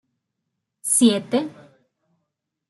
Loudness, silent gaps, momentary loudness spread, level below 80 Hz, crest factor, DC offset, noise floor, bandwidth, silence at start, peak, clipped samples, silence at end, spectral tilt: -19 LUFS; none; 15 LU; -70 dBFS; 20 dB; under 0.1%; -79 dBFS; 12.5 kHz; 0.85 s; -4 dBFS; under 0.1%; 1.2 s; -3 dB/octave